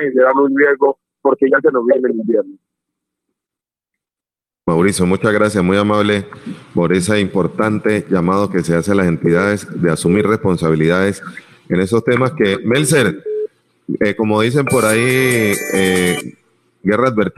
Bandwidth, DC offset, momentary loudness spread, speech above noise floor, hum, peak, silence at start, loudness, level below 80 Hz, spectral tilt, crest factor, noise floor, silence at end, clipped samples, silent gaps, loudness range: 14 kHz; under 0.1%; 8 LU; 75 dB; none; -2 dBFS; 0 s; -15 LUFS; -48 dBFS; -5.5 dB/octave; 14 dB; -89 dBFS; 0.1 s; under 0.1%; none; 3 LU